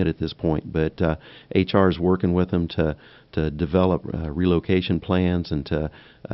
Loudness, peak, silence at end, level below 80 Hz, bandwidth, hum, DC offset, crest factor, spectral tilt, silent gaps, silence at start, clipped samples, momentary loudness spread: -23 LUFS; -4 dBFS; 0 s; -40 dBFS; 5.8 kHz; none; under 0.1%; 20 dB; -6.5 dB/octave; none; 0 s; under 0.1%; 8 LU